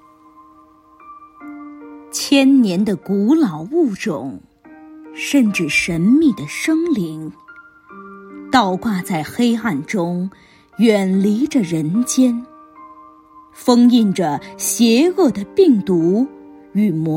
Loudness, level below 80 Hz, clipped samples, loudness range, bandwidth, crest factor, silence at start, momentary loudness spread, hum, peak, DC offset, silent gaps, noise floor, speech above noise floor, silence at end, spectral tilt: -16 LUFS; -56 dBFS; under 0.1%; 5 LU; 16.5 kHz; 16 dB; 1.1 s; 21 LU; none; -2 dBFS; under 0.1%; none; -48 dBFS; 32 dB; 0 s; -5 dB/octave